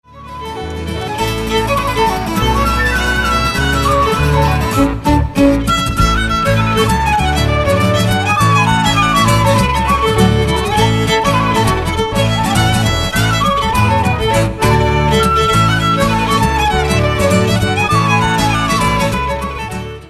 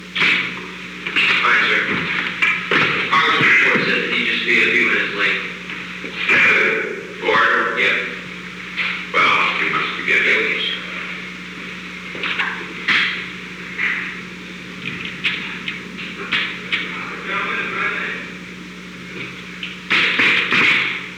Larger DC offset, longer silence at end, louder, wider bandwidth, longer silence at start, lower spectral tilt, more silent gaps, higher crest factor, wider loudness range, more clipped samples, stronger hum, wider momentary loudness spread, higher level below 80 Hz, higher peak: neither; about the same, 0 s vs 0 s; first, -13 LUFS vs -17 LUFS; second, 13.5 kHz vs 18.5 kHz; first, 0.15 s vs 0 s; first, -5 dB/octave vs -3.5 dB/octave; neither; about the same, 12 dB vs 16 dB; second, 2 LU vs 9 LU; neither; neither; second, 5 LU vs 16 LU; first, -24 dBFS vs -54 dBFS; first, 0 dBFS vs -4 dBFS